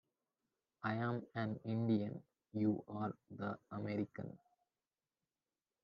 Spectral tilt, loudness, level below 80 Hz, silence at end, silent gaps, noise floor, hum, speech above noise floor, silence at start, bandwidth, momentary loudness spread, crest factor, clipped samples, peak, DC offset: -7.5 dB/octave; -42 LUFS; -84 dBFS; 1.45 s; none; under -90 dBFS; none; over 49 dB; 0.8 s; 5.6 kHz; 12 LU; 18 dB; under 0.1%; -26 dBFS; under 0.1%